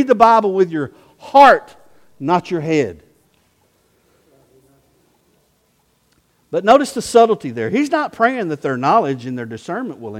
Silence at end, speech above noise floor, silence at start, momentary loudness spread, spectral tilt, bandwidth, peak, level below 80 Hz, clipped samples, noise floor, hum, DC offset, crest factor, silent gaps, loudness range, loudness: 0 s; 46 dB; 0 s; 15 LU; -5.5 dB/octave; 15.5 kHz; 0 dBFS; -56 dBFS; under 0.1%; -61 dBFS; none; under 0.1%; 18 dB; none; 10 LU; -16 LUFS